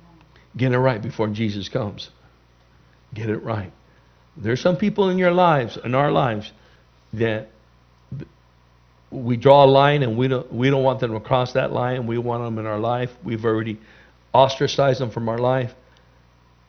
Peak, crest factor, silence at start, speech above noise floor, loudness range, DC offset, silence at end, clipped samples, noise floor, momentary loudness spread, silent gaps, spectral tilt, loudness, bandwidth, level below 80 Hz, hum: 0 dBFS; 22 dB; 0.55 s; 35 dB; 9 LU; under 0.1%; 0.95 s; under 0.1%; -55 dBFS; 17 LU; none; -7 dB/octave; -20 LUFS; 6.6 kHz; -54 dBFS; 60 Hz at -50 dBFS